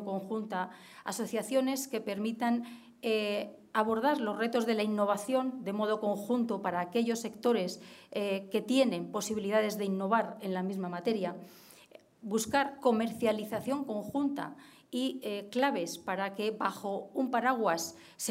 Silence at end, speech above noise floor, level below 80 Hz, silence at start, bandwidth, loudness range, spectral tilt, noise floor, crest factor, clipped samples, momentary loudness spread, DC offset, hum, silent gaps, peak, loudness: 0 s; 25 dB; -78 dBFS; 0 s; 16 kHz; 3 LU; -4.5 dB/octave; -57 dBFS; 18 dB; under 0.1%; 9 LU; under 0.1%; none; none; -14 dBFS; -33 LUFS